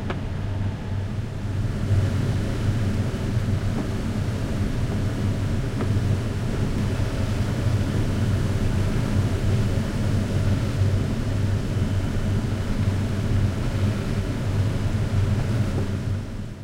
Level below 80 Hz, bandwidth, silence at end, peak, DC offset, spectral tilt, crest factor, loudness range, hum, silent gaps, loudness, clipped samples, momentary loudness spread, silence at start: -32 dBFS; 12.5 kHz; 0 s; -10 dBFS; under 0.1%; -7 dB/octave; 12 dB; 2 LU; none; none; -25 LUFS; under 0.1%; 4 LU; 0 s